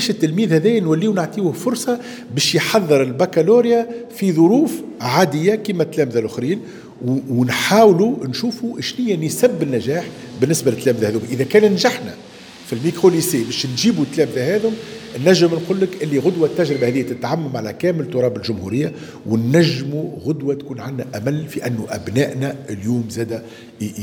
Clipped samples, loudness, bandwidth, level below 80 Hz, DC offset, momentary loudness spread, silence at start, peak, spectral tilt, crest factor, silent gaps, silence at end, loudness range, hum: under 0.1%; -18 LUFS; over 20 kHz; -60 dBFS; under 0.1%; 12 LU; 0 s; 0 dBFS; -5.5 dB/octave; 18 dB; none; 0 s; 4 LU; none